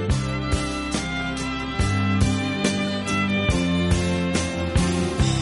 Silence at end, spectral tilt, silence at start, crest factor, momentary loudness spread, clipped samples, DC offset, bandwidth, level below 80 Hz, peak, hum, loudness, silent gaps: 0 s; -5 dB/octave; 0 s; 16 dB; 5 LU; under 0.1%; under 0.1%; 11.5 kHz; -32 dBFS; -6 dBFS; none; -23 LUFS; none